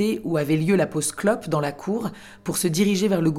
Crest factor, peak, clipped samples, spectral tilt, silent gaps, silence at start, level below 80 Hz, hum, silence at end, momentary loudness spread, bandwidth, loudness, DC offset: 16 dB; -6 dBFS; under 0.1%; -5.5 dB/octave; none; 0 s; -56 dBFS; none; 0 s; 8 LU; 16.5 kHz; -23 LUFS; under 0.1%